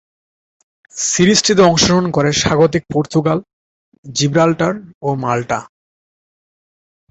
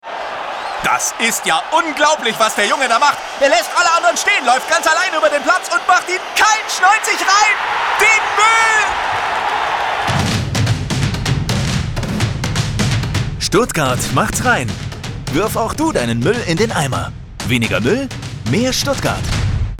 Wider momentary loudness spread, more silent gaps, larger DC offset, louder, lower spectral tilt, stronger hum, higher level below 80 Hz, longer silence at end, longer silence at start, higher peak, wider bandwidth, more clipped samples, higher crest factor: first, 12 LU vs 8 LU; first, 3.53-3.92 s, 3.98-4.03 s, 4.95-5.01 s vs none; neither; about the same, -15 LUFS vs -15 LUFS; about the same, -4 dB/octave vs -3.5 dB/octave; neither; second, -44 dBFS vs -32 dBFS; first, 1.45 s vs 0 s; first, 0.95 s vs 0.05 s; about the same, 0 dBFS vs 0 dBFS; second, 8.4 kHz vs 19 kHz; neither; about the same, 16 dB vs 14 dB